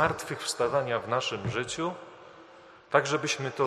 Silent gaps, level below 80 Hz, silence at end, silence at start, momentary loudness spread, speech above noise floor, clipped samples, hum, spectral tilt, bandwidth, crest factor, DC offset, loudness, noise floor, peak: none; -62 dBFS; 0 s; 0 s; 18 LU; 24 dB; under 0.1%; none; -3.5 dB/octave; 13 kHz; 24 dB; under 0.1%; -29 LUFS; -52 dBFS; -6 dBFS